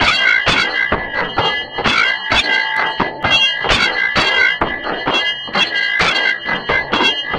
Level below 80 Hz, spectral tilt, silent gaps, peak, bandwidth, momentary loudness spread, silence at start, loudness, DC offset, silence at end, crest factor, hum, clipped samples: -38 dBFS; -2.5 dB/octave; none; 0 dBFS; 12.5 kHz; 6 LU; 0 s; -14 LUFS; under 0.1%; 0 s; 16 dB; none; under 0.1%